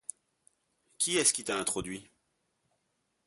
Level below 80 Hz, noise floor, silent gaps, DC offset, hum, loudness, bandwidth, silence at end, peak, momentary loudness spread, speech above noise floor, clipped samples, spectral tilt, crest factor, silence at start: -66 dBFS; -79 dBFS; none; under 0.1%; none; -29 LUFS; 12 kHz; 1.25 s; -12 dBFS; 18 LU; 48 dB; under 0.1%; -1.5 dB/octave; 24 dB; 1 s